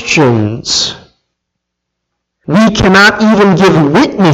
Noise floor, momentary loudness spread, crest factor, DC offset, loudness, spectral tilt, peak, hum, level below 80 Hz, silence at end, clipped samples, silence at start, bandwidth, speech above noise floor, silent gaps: -73 dBFS; 7 LU; 10 dB; under 0.1%; -8 LUFS; -5 dB/octave; 0 dBFS; none; -34 dBFS; 0 s; 0.2%; 0 s; 14 kHz; 66 dB; none